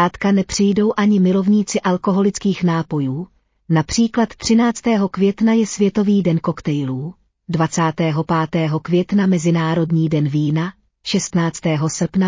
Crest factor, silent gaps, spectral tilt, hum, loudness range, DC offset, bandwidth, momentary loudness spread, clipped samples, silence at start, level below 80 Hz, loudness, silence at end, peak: 14 dB; none; -6 dB/octave; none; 2 LU; under 0.1%; 7.6 kHz; 6 LU; under 0.1%; 0 s; -48 dBFS; -18 LUFS; 0 s; -4 dBFS